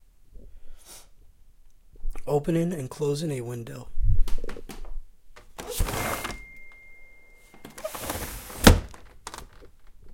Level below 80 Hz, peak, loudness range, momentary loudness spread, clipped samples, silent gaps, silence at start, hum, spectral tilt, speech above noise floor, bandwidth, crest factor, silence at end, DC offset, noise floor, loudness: -32 dBFS; 0 dBFS; 8 LU; 24 LU; under 0.1%; none; 0.35 s; none; -4.5 dB/octave; 23 dB; 16.5 kHz; 26 dB; 0 s; under 0.1%; -51 dBFS; -27 LUFS